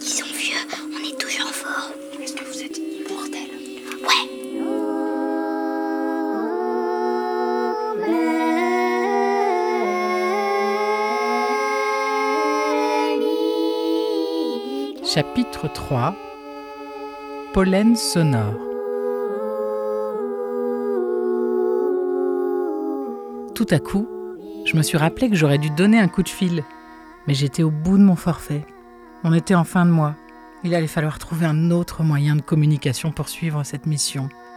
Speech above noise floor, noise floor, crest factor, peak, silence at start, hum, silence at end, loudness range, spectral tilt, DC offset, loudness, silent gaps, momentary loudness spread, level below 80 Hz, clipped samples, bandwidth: 25 dB; -43 dBFS; 18 dB; -4 dBFS; 0 s; none; 0 s; 5 LU; -5.5 dB/octave; under 0.1%; -21 LUFS; none; 12 LU; -48 dBFS; under 0.1%; 18.5 kHz